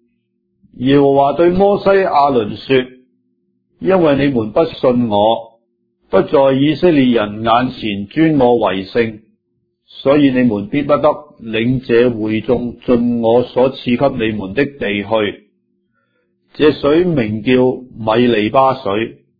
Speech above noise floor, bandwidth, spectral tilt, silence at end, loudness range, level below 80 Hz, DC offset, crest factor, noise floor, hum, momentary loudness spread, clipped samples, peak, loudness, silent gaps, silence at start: 54 dB; 5 kHz; -9.5 dB/octave; 0.25 s; 3 LU; -44 dBFS; under 0.1%; 14 dB; -67 dBFS; none; 8 LU; under 0.1%; 0 dBFS; -14 LUFS; none; 0.8 s